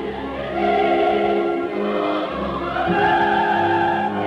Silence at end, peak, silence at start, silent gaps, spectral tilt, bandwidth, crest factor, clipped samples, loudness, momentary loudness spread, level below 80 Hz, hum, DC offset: 0 s; -8 dBFS; 0 s; none; -7 dB/octave; 8 kHz; 12 dB; under 0.1%; -20 LUFS; 7 LU; -44 dBFS; none; under 0.1%